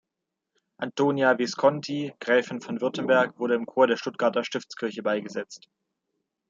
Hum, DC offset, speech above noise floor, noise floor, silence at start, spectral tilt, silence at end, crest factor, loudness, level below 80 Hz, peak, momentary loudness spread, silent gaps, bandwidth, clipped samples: none; under 0.1%; 60 dB; -85 dBFS; 0.8 s; -5 dB/octave; 0.9 s; 20 dB; -25 LUFS; -78 dBFS; -6 dBFS; 11 LU; none; 7.6 kHz; under 0.1%